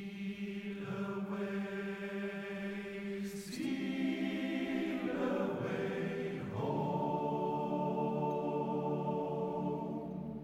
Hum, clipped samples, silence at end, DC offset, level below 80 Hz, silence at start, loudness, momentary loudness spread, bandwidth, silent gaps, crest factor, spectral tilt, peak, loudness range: none; under 0.1%; 0 s; under 0.1%; -70 dBFS; 0 s; -38 LUFS; 6 LU; 16 kHz; none; 14 dB; -7 dB/octave; -24 dBFS; 4 LU